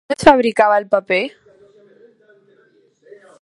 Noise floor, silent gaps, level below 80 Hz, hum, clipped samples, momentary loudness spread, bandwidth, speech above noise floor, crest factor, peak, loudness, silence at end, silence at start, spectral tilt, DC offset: -55 dBFS; none; -50 dBFS; none; under 0.1%; 8 LU; 11.5 kHz; 41 dB; 18 dB; 0 dBFS; -15 LUFS; 2.15 s; 0.1 s; -4.5 dB/octave; under 0.1%